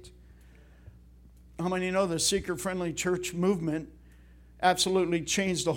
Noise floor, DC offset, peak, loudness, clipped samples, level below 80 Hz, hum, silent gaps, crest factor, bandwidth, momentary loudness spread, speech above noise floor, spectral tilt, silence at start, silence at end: -54 dBFS; under 0.1%; -8 dBFS; -28 LUFS; under 0.1%; -54 dBFS; none; none; 22 dB; 18 kHz; 9 LU; 26 dB; -4 dB/octave; 0 s; 0 s